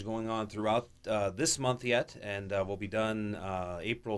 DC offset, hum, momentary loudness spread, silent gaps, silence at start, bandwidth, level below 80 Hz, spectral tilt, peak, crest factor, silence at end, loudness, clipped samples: under 0.1%; none; 7 LU; none; 0 s; 11 kHz; -60 dBFS; -4 dB/octave; -16 dBFS; 16 dB; 0 s; -33 LUFS; under 0.1%